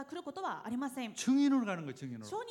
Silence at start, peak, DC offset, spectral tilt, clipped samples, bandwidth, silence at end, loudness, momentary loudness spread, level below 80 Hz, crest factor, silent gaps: 0 s; -22 dBFS; under 0.1%; -4.5 dB/octave; under 0.1%; 13.5 kHz; 0 s; -35 LUFS; 14 LU; -82 dBFS; 14 dB; none